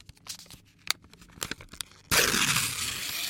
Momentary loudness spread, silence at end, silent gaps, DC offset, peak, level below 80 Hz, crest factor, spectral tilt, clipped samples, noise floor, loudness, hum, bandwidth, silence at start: 19 LU; 0 s; none; under 0.1%; -4 dBFS; -54 dBFS; 26 dB; -1 dB/octave; under 0.1%; -52 dBFS; -27 LUFS; none; 17 kHz; 0.25 s